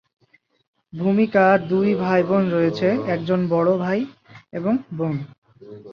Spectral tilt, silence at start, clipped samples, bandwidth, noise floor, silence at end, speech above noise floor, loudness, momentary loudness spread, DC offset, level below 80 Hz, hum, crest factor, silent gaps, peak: -9 dB/octave; 0.95 s; under 0.1%; 6.6 kHz; -41 dBFS; 0 s; 22 dB; -20 LUFS; 12 LU; under 0.1%; -62 dBFS; none; 18 dB; 5.38-5.42 s; -4 dBFS